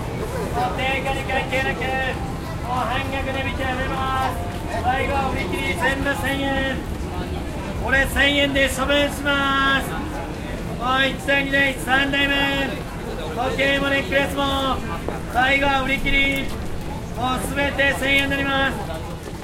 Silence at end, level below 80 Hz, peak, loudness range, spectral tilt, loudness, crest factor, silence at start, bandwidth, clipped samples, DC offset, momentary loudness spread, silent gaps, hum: 0 s; -32 dBFS; -4 dBFS; 4 LU; -4.5 dB/octave; -21 LUFS; 18 dB; 0 s; 16 kHz; under 0.1%; under 0.1%; 11 LU; none; none